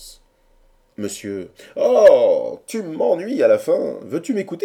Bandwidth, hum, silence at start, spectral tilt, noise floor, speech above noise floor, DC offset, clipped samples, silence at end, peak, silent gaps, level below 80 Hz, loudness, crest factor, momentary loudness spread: 16 kHz; none; 0 s; -5 dB/octave; -56 dBFS; 38 dB; under 0.1%; under 0.1%; 0 s; -2 dBFS; none; -58 dBFS; -18 LUFS; 16 dB; 18 LU